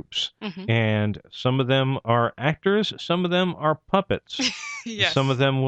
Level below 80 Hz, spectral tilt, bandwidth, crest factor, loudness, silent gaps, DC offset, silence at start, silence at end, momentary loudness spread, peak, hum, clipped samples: -56 dBFS; -5.5 dB/octave; 8.4 kHz; 20 dB; -23 LUFS; none; under 0.1%; 0.1 s; 0 s; 7 LU; -4 dBFS; none; under 0.1%